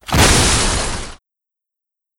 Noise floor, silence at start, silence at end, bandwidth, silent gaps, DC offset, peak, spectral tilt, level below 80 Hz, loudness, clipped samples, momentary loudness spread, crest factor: -84 dBFS; 0.05 s; 1.05 s; 17 kHz; none; under 0.1%; -2 dBFS; -3 dB/octave; -24 dBFS; -13 LUFS; under 0.1%; 17 LU; 16 dB